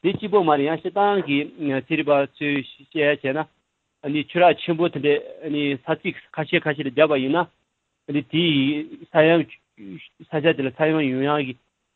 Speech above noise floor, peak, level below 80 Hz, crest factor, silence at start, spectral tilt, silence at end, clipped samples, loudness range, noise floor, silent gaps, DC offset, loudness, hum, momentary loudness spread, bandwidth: 37 dB; -2 dBFS; -64 dBFS; 20 dB; 0.05 s; -9.5 dB/octave; 0.4 s; under 0.1%; 2 LU; -58 dBFS; none; under 0.1%; -22 LUFS; none; 13 LU; 4.3 kHz